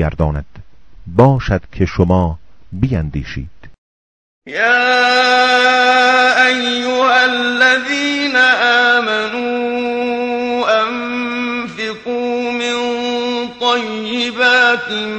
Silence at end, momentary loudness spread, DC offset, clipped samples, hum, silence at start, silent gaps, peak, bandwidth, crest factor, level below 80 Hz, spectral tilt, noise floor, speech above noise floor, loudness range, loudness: 0 s; 11 LU; under 0.1%; under 0.1%; none; 0 s; 3.78-4.42 s; 0 dBFS; 9.4 kHz; 14 dB; -34 dBFS; -4.5 dB/octave; -39 dBFS; 26 dB; 7 LU; -14 LUFS